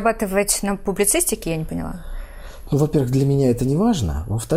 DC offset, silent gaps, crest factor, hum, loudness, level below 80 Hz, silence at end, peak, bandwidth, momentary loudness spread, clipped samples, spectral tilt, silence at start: under 0.1%; none; 16 dB; none; -20 LUFS; -34 dBFS; 0 s; -4 dBFS; 16 kHz; 18 LU; under 0.1%; -5 dB/octave; 0 s